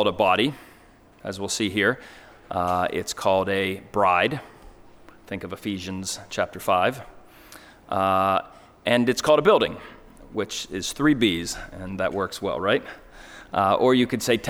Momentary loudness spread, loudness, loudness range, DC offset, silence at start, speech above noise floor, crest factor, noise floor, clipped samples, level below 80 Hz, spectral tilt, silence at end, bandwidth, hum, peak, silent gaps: 16 LU; -23 LUFS; 4 LU; under 0.1%; 0 s; 29 dB; 20 dB; -52 dBFS; under 0.1%; -52 dBFS; -4 dB/octave; 0 s; over 20 kHz; none; -4 dBFS; none